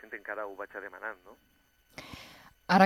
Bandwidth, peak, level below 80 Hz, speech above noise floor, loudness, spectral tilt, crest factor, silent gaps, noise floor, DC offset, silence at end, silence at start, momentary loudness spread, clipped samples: 13.5 kHz; -8 dBFS; -66 dBFS; 12 dB; -38 LUFS; -6 dB/octave; 24 dB; none; -54 dBFS; under 0.1%; 0 s; 0.1 s; 13 LU; under 0.1%